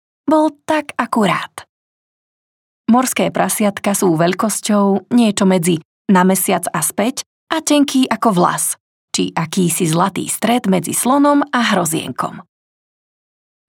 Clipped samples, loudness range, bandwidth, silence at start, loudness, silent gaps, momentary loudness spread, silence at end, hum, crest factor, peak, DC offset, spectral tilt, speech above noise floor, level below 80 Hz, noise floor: under 0.1%; 3 LU; 19 kHz; 0.25 s; -16 LUFS; 1.69-2.84 s, 5.85-6.05 s, 7.26-7.47 s, 8.80-9.08 s; 7 LU; 1.3 s; none; 14 dB; -2 dBFS; under 0.1%; -4.5 dB/octave; over 75 dB; -66 dBFS; under -90 dBFS